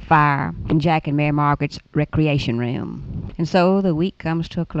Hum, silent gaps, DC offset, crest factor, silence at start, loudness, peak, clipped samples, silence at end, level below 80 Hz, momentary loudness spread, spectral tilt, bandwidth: none; none; under 0.1%; 16 dB; 0 s; -20 LUFS; -4 dBFS; under 0.1%; 0 s; -40 dBFS; 9 LU; -8 dB/octave; 7.8 kHz